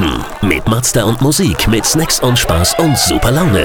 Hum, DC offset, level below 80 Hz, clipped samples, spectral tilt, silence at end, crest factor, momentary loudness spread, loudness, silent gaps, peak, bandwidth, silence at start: none; under 0.1%; -24 dBFS; under 0.1%; -4 dB/octave; 0 s; 12 dB; 3 LU; -12 LUFS; none; 0 dBFS; over 20 kHz; 0 s